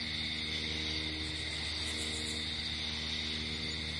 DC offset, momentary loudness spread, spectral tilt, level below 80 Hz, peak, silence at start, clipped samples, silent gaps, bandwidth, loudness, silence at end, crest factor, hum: under 0.1%; 2 LU; -2.5 dB/octave; -50 dBFS; -24 dBFS; 0 s; under 0.1%; none; 11.5 kHz; -35 LUFS; 0 s; 12 dB; none